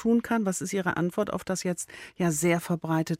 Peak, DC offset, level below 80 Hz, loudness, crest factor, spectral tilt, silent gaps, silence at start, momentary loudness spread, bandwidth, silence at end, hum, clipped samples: -10 dBFS; under 0.1%; -60 dBFS; -28 LUFS; 16 dB; -5.5 dB/octave; none; 0 s; 6 LU; 16 kHz; 0.05 s; none; under 0.1%